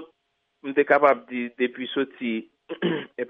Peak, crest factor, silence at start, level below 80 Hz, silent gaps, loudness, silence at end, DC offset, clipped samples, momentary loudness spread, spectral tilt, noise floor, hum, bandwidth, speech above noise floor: -6 dBFS; 20 dB; 0 s; -80 dBFS; none; -24 LUFS; 0 s; under 0.1%; under 0.1%; 14 LU; -7.5 dB/octave; -75 dBFS; none; 5.2 kHz; 51 dB